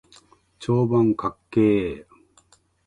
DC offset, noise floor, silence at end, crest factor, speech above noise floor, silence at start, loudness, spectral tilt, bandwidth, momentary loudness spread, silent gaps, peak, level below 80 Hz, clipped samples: under 0.1%; -59 dBFS; 0.85 s; 16 dB; 38 dB; 0.6 s; -22 LUFS; -8.5 dB/octave; 10.5 kHz; 13 LU; none; -8 dBFS; -52 dBFS; under 0.1%